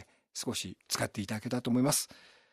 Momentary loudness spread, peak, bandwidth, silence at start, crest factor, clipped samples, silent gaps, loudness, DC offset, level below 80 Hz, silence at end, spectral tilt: 11 LU; -16 dBFS; 15.5 kHz; 0 s; 20 dB; under 0.1%; none; -33 LUFS; under 0.1%; -70 dBFS; 0.35 s; -4 dB/octave